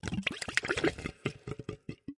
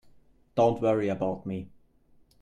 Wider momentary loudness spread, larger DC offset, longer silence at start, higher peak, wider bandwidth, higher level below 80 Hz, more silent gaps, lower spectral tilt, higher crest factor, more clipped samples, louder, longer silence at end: about the same, 12 LU vs 14 LU; neither; second, 0.05 s vs 0.55 s; first, -6 dBFS vs -12 dBFS; first, 11.5 kHz vs 9.4 kHz; first, -54 dBFS vs -60 dBFS; neither; second, -4 dB/octave vs -8 dB/octave; first, 30 dB vs 18 dB; neither; second, -35 LUFS vs -28 LUFS; second, 0.05 s vs 0.75 s